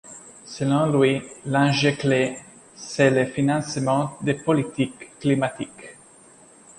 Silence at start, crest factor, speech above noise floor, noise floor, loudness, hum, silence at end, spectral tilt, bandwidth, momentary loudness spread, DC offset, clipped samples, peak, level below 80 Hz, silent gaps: 0.05 s; 18 dB; 29 dB; -50 dBFS; -22 LUFS; none; 0.85 s; -5.5 dB/octave; 11.5 kHz; 20 LU; under 0.1%; under 0.1%; -4 dBFS; -60 dBFS; none